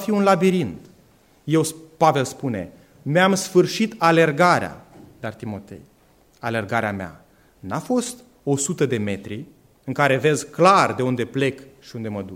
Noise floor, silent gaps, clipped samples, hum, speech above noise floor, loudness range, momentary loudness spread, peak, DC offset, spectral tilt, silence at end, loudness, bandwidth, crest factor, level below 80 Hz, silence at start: -56 dBFS; none; under 0.1%; none; 36 dB; 8 LU; 18 LU; -2 dBFS; under 0.1%; -5 dB/octave; 0 s; -20 LUFS; 16.5 kHz; 20 dB; -62 dBFS; 0 s